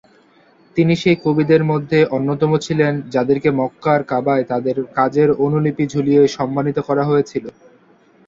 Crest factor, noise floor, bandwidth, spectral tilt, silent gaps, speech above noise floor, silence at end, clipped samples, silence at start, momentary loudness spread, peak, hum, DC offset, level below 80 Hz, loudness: 16 dB; -52 dBFS; 7.8 kHz; -7.5 dB/octave; none; 36 dB; 0.75 s; under 0.1%; 0.75 s; 6 LU; -2 dBFS; none; under 0.1%; -54 dBFS; -17 LUFS